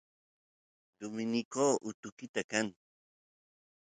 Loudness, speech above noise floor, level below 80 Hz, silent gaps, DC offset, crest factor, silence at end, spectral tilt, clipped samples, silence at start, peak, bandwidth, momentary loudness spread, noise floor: -35 LUFS; over 55 dB; -80 dBFS; 1.45-1.51 s, 1.94-2.03 s, 2.12-2.17 s, 2.29-2.34 s, 2.44-2.49 s; under 0.1%; 22 dB; 1.25 s; -3.5 dB/octave; under 0.1%; 1 s; -16 dBFS; 9.4 kHz; 14 LU; under -90 dBFS